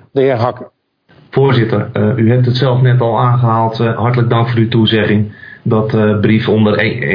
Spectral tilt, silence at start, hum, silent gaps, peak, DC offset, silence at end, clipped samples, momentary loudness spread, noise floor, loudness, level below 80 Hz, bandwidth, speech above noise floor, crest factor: -9.5 dB/octave; 0.15 s; none; none; 0 dBFS; under 0.1%; 0 s; under 0.1%; 5 LU; -48 dBFS; -12 LUFS; -50 dBFS; 5.4 kHz; 37 dB; 12 dB